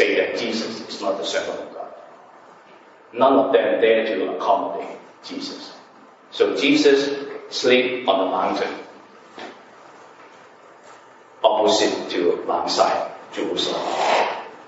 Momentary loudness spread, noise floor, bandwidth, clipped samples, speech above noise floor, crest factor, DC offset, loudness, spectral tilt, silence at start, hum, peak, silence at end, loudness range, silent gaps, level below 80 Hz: 19 LU; -48 dBFS; 8 kHz; under 0.1%; 28 dB; 20 dB; under 0.1%; -20 LUFS; -3 dB/octave; 0 s; none; -2 dBFS; 0 s; 6 LU; none; -74 dBFS